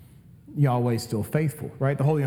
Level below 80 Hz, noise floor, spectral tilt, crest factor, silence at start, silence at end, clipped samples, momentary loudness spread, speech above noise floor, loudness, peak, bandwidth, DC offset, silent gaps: -60 dBFS; -49 dBFS; -7.5 dB/octave; 16 dB; 0.5 s; 0 s; under 0.1%; 6 LU; 25 dB; -25 LUFS; -10 dBFS; 16.5 kHz; under 0.1%; none